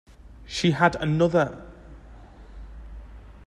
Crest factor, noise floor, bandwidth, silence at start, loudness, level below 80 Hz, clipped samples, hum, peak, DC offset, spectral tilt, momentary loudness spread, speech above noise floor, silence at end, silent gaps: 22 dB; -46 dBFS; 11 kHz; 0.3 s; -23 LUFS; -44 dBFS; under 0.1%; none; -6 dBFS; under 0.1%; -6 dB/octave; 24 LU; 24 dB; 0.1 s; none